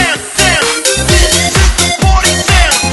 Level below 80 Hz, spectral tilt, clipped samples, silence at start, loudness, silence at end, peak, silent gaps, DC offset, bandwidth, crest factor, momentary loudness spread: -14 dBFS; -2.5 dB/octave; 0.3%; 0 s; -9 LUFS; 0 s; 0 dBFS; none; under 0.1%; 12.5 kHz; 10 dB; 2 LU